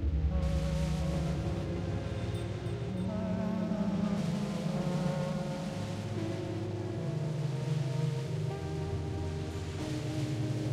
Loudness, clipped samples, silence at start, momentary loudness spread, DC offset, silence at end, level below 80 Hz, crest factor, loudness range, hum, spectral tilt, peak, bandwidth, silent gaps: -35 LUFS; under 0.1%; 0 s; 5 LU; under 0.1%; 0 s; -42 dBFS; 14 dB; 1 LU; none; -7 dB/octave; -20 dBFS; 13 kHz; none